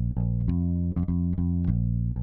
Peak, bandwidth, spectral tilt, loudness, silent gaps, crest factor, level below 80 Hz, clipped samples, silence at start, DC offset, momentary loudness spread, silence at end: -12 dBFS; 2.3 kHz; -13.5 dB/octave; -27 LUFS; none; 14 dB; -34 dBFS; under 0.1%; 0 s; under 0.1%; 1 LU; 0 s